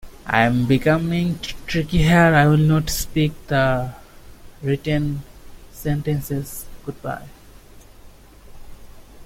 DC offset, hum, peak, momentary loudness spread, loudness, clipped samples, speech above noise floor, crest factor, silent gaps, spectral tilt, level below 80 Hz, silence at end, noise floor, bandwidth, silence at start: under 0.1%; none; -2 dBFS; 17 LU; -20 LUFS; under 0.1%; 26 dB; 18 dB; none; -6 dB/octave; -36 dBFS; 0 s; -44 dBFS; 16.5 kHz; 0.05 s